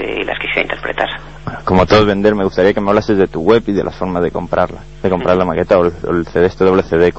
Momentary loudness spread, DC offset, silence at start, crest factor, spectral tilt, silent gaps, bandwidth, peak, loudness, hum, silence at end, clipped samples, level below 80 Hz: 8 LU; 1%; 0 s; 14 dB; -7 dB/octave; none; 8 kHz; 0 dBFS; -14 LUFS; none; 0 s; under 0.1%; -34 dBFS